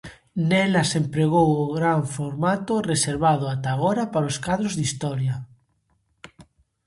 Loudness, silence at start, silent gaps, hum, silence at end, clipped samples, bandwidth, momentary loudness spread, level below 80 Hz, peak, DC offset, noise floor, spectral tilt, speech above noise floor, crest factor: -23 LUFS; 0.05 s; none; none; 0.45 s; under 0.1%; 11.5 kHz; 7 LU; -54 dBFS; -6 dBFS; under 0.1%; -68 dBFS; -5.5 dB/octave; 46 dB; 18 dB